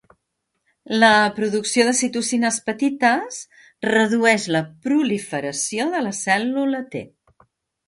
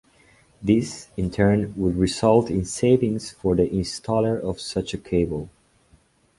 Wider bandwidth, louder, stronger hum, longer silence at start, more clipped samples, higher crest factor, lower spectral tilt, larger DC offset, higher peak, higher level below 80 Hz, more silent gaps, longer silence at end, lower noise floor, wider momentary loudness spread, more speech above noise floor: about the same, 11.5 kHz vs 11.5 kHz; first, -20 LUFS vs -23 LUFS; neither; first, 0.9 s vs 0.6 s; neither; about the same, 20 dB vs 20 dB; second, -3 dB/octave vs -6.5 dB/octave; neither; about the same, -2 dBFS vs -4 dBFS; second, -64 dBFS vs -42 dBFS; neither; about the same, 0.8 s vs 0.9 s; first, -76 dBFS vs -59 dBFS; about the same, 10 LU vs 9 LU; first, 56 dB vs 37 dB